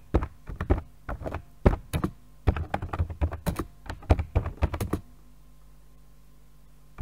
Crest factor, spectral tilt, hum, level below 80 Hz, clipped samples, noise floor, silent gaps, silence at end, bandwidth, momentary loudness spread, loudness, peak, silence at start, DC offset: 26 dB; -7.5 dB/octave; none; -34 dBFS; under 0.1%; -55 dBFS; none; 0 s; 16 kHz; 12 LU; -31 LUFS; -4 dBFS; 0.15 s; 0.3%